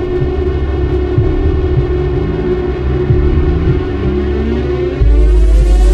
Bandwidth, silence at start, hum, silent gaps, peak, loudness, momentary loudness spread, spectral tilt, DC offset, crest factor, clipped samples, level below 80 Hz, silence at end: 6.6 kHz; 0 s; none; none; 0 dBFS; -14 LUFS; 5 LU; -8.5 dB/octave; under 0.1%; 10 dB; under 0.1%; -12 dBFS; 0 s